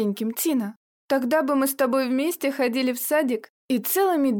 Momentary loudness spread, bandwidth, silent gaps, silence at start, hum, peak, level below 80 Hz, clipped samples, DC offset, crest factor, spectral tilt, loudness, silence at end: 6 LU; over 20 kHz; 0.76-1.09 s, 3.50-3.69 s; 0 s; none; -12 dBFS; -74 dBFS; under 0.1%; under 0.1%; 12 dB; -4 dB/octave; -23 LUFS; 0 s